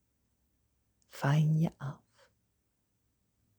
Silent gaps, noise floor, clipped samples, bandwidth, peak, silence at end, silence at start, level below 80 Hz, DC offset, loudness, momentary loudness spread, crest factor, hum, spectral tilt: none; -78 dBFS; under 0.1%; over 20 kHz; -18 dBFS; 1.65 s; 1.15 s; -70 dBFS; under 0.1%; -31 LUFS; 16 LU; 18 dB; none; -7.5 dB/octave